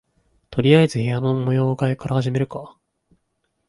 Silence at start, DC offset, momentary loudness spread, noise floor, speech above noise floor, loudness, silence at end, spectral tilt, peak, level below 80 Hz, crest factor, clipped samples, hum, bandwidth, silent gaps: 0.5 s; under 0.1%; 12 LU; -72 dBFS; 53 dB; -20 LUFS; 1 s; -7.5 dB/octave; -2 dBFS; -54 dBFS; 18 dB; under 0.1%; none; 11.5 kHz; none